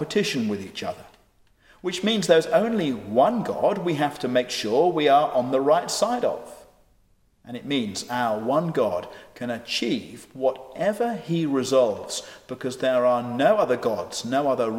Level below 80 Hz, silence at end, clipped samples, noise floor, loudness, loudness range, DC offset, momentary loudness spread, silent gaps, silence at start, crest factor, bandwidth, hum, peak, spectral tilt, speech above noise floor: -64 dBFS; 0 s; under 0.1%; -62 dBFS; -24 LUFS; 5 LU; under 0.1%; 13 LU; none; 0 s; 20 dB; 16.5 kHz; none; -4 dBFS; -4.5 dB/octave; 38 dB